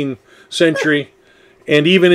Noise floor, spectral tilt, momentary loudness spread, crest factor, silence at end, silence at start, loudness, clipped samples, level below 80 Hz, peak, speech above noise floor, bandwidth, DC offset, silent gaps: -49 dBFS; -5 dB/octave; 22 LU; 16 dB; 0 s; 0 s; -15 LUFS; under 0.1%; -64 dBFS; 0 dBFS; 35 dB; 12.5 kHz; under 0.1%; none